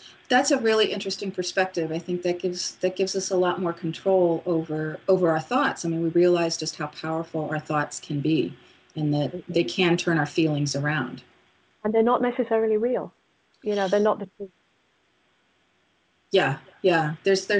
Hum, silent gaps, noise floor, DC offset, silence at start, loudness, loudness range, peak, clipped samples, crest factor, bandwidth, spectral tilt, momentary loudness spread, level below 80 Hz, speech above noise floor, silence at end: none; none; -67 dBFS; under 0.1%; 0 s; -25 LUFS; 4 LU; -6 dBFS; under 0.1%; 18 dB; 9.6 kHz; -5 dB/octave; 9 LU; -68 dBFS; 43 dB; 0 s